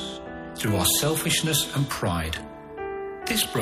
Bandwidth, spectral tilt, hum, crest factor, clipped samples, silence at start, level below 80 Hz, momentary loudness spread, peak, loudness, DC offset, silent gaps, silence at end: 15.5 kHz; -3 dB/octave; none; 18 dB; under 0.1%; 0 s; -46 dBFS; 15 LU; -10 dBFS; -25 LUFS; under 0.1%; none; 0 s